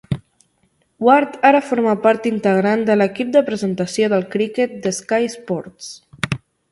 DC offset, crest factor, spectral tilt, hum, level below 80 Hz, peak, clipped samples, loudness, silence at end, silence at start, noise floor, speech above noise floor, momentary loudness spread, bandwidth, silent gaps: under 0.1%; 18 dB; -5.5 dB/octave; none; -52 dBFS; 0 dBFS; under 0.1%; -18 LUFS; 0.35 s; 0.1 s; -63 dBFS; 46 dB; 13 LU; 11.5 kHz; none